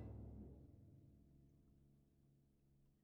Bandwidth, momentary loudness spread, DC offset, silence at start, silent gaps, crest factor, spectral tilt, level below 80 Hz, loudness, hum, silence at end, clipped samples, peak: 2.8 kHz; 12 LU; under 0.1%; 0 s; none; 18 dB; -11 dB/octave; -68 dBFS; -61 LUFS; none; 0 s; under 0.1%; -44 dBFS